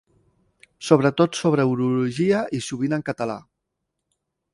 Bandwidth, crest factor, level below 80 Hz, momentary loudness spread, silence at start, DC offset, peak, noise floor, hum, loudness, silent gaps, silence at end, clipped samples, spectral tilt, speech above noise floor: 11.5 kHz; 22 dB; -62 dBFS; 10 LU; 0.8 s; under 0.1%; 0 dBFS; -79 dBFS; none; -22 LUFS; none; 1.15 s; under 0.1%; -6 dB/octave; 59 dB